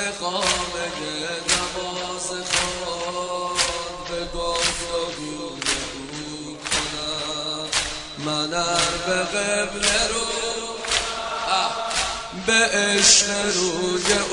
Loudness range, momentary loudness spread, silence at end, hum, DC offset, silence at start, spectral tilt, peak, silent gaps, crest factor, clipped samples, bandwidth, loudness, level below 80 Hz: 7 LU; 10 LU; 0 s; none; under 0.1%; 0 s; -1 dB/octave; -2 dBFS; none; 22 dB; under 0.1%; 11 kHz; -22 LUFS; -44 dBFS